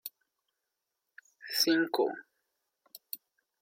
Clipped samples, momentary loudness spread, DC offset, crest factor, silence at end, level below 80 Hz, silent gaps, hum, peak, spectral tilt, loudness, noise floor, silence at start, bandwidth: under 0.1%; 20 LU; under 0.1%; 22 dB; 0.45 s; -88 dBFS; none; none; -14 dBFS; -2 dB/octave; -29 LUFS; -86 dBFS; 0.05 s; 16.5 kHz